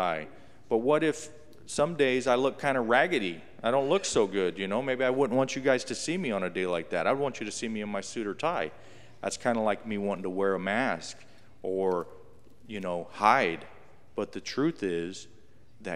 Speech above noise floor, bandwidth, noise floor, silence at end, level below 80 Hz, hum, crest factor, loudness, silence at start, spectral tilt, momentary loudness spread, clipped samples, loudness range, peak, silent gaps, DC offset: 29 dB; 13 kHz; -57 dBFS; 0 s; -66 dBFS; none; 24 dB; -29 LUFS; 0 s; -4.5 dB/octave; 13 LU; under 0.1%; 5 LU; -6 dBFS; none; 0.4%